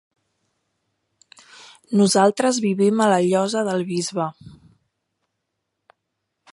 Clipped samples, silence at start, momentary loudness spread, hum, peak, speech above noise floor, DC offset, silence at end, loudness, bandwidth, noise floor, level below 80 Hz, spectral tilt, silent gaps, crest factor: under 0.1%; 1.9 s; 9 LU; none; -2 dBFS; 59 dB; under 0.1%; 2.05 s; -19 LUFS; 11.5 kHz; -78 dBFS; -68 dBFS; -5 dB/octave; none; 20 dB